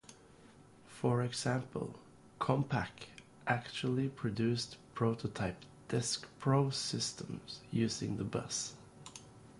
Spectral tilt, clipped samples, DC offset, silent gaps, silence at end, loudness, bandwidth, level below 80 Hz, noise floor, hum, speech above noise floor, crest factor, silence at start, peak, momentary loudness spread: -5 dB/octave; under 0.1%; under 0.1%; none; 0 s; -37 LUFS; 11.5 kHz; -64 dBFS; -60 dBFS; none; 24 dB; 20 dB; 0.1 s; -16 dBFS; 18 LU